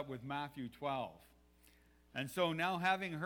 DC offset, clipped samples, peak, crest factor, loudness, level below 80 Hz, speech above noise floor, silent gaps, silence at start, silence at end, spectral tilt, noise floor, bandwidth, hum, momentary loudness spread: under 0.1%; under 0.1%; -20 dBFS; 20 dB; -39 LUFS; -72 dBFS; 28 dB; none; 0 s; 0 s; -5 dB/octave; -67 dBFS; over 20 kHz; none; 11 LU